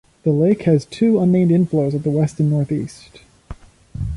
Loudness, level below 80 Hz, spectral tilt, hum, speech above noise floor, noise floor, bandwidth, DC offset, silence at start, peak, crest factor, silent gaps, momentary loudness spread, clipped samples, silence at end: -17 LUFS; -40 dBFS; -9 dB/octave; none; 21 dB; -38 dBFS; 11 kHz; under 0.1%; 0.25 s; -4 dBFS; 14 dB; none; 10 LU; under 0.1%; 0 s